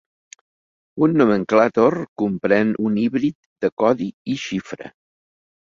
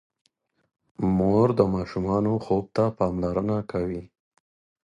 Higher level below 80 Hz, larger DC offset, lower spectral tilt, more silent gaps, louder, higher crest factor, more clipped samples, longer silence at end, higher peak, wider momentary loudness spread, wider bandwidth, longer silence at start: second, -60 dBFS vs -48 dBFS; neither; second, -7 dB/octave vs -9.5 dB/octave; first, 2.08-2.16 s, 3.35-3.56 s, 3.72-3.77 s, 4.14-4.25 s vs none; first, -19 LUFS vs -25 LUFS; about the same, 18 dB vs 22 dB; neither; about the same, 0.8 s vs 0.8 s; about the same, -2 dBFS vs -4 dBFS; first, 12 LU vs 9 LU; second, 7.6 kHz vs 9.2 kHz; about the same, 0.95 s vs 1 s